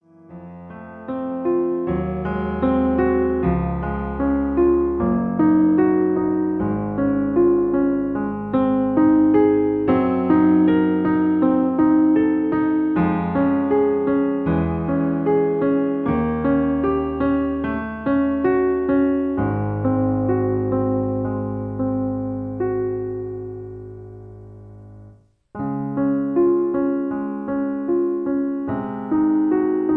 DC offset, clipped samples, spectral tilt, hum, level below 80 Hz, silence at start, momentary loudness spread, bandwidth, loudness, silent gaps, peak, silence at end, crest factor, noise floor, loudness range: under 0.1%; under 0.1%; -11.5 dB/octave; none; -40 dBFS; 0.3 s; 10 LU; 4 kHz; -20 LUFS; none; -6 dBFS; 0 s; 14 dB; -49 dBFS; 8 LU